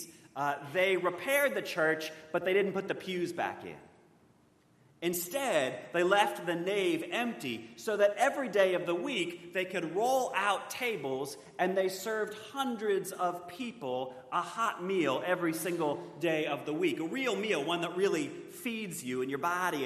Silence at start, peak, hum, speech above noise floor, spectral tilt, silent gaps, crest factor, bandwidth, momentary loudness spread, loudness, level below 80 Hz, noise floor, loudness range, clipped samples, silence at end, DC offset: 0 s; -12 dBFS; none; 33 dB; -4 dB/octave; none; 22 dB; 13.5 kHz; 9 LU; -32 LUFS; -82 dBFS; -66 dBFS; 4 LU; under 0.1%; 0 s; under 0.1%